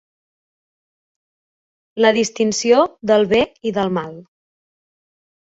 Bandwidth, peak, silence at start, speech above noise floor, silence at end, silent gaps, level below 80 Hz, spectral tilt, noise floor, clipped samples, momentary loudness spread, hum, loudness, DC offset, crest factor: 8 kHz; -2 dBFS; 1.95 s; over 73 dB; 1.25 s; none; -58 dBFS; -4 dB/octave; under -90 dBFS; under 0.1%; 9 LU; none; -17 LUFS; under 0.1%; 18 dB